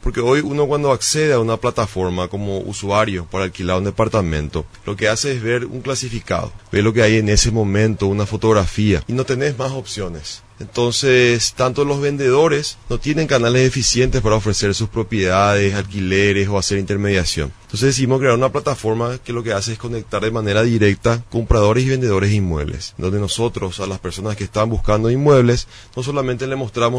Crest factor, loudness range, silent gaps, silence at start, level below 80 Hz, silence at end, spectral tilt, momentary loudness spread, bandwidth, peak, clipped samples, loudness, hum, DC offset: 18 dB; 4 LU; none; 0 s; -32 dBFS; 0 s; -5 dB/octave; 10 LU; 11 kHz; 0 dBFS; under 0.1%; -18 LUFS; none; under 0.1%